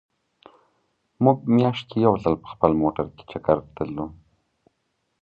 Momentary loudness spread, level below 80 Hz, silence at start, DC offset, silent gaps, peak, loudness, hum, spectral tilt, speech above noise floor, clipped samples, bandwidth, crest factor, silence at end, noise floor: 11 LU; -50 dBFS; 1.2 s; under 0.1%; none; -2 dBFS; -23 LUFS; none; -9.5 dB/octave; 52 dB; under 0.1%; 6.8 kHz; 22 dB; 1.1 s; -74 dBFS